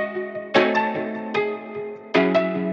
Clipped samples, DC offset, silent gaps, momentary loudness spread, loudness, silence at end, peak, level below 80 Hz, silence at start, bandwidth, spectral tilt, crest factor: under 0.1%; under 0.1%; none; 12 LU; -22 LUFS; 0 s; -4 dBFS; -76 dBFS; 0 s; 7.8 kHz; -6.5 dB/octave; 20 dB